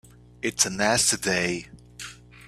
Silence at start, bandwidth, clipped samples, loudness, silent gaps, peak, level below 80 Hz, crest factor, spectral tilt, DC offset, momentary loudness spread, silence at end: 0.45 s; 15.5 kHz; under 0.1%; -23 LUFS; none; -6 dBFS; -54 dBFS; 22 dB; -2 dB/octave; under 0.1%; 19 LU; 0.05 s